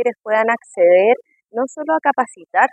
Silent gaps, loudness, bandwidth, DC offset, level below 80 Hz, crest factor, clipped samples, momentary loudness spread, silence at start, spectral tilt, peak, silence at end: none; -17 LUFS; 9.2 kHz; under 0.1%; -78 dBFS; 16 dB; under 0.1%; 11 LU; 0 s; -4.5 dB/octave; 0 dBFS; 0.05 s